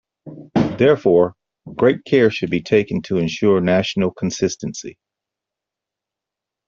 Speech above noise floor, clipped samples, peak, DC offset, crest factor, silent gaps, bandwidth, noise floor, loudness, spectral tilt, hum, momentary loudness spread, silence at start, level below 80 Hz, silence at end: 68 dB; under 0.1%; -2 dBFS; under 0.1%; 16 dB; none; 7.6 kHz; -85 dBFS; -18 LUFS; -6 dB/octave; none; 10 LU; 0.25 s; -54 dBFS; 1.75 s